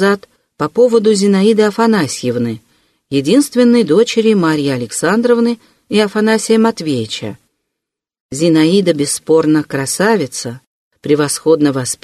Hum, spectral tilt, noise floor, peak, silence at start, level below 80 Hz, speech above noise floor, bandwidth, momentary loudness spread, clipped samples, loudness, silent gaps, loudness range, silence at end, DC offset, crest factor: none; -5 dB/octave; -80 dBFS; 0 dBFS; 0 s; -56 dBFS; 67 dB; 13 kHz; 11 LU; under 0.1%; -13 LUFS; 8.20-8.29 s, 10.67-10.91 s; 2 LU; 0.1 s; under 0.1%; 12 dB